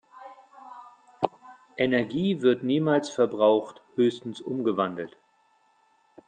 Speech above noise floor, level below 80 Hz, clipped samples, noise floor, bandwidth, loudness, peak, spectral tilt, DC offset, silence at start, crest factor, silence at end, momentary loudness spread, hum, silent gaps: 41 dB; -70 dBFS; under 0.1%; -65 dBFS; 9.4 kHz; -26 LUFS; -4 dBFS; -6.5 dB/octave; under 0.1%; 0.15 s; 22 dB; 1.2 s; 24 LU; none; none